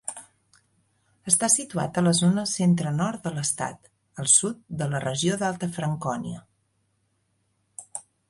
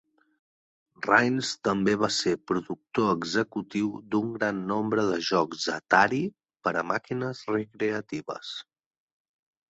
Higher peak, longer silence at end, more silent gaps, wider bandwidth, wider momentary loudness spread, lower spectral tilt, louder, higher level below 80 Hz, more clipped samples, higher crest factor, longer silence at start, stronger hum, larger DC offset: about the same, -4 dBFS vs -4 dBFS; second, 0.3 s vs 1.1 s; neither; first, 12 kHz vs 8.2 kHz; first, 20 LU vs 12 LU; about the same, -4 dB/octave vs -4.5 dB/octave; first, -24 LUFS vs -27 LUFS; about the same, -64 dBFS vs -66 dBFS; neither; about the same, 22 dB vs 24 dB; second, 0.05 s vs 1 s; neither; neither